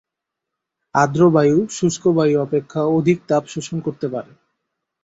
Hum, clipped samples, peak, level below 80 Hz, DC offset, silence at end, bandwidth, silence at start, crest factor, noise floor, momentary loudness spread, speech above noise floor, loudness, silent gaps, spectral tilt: none; under 0.1%; -2 dBFS; -56 dBFS; under 0.1%; 0.8 s; 8 kHz; 0.95 s; 18 dB; -82 dBFS; 12 LU; 65 dB; -18 LUFS; none; -6.5 dB/octave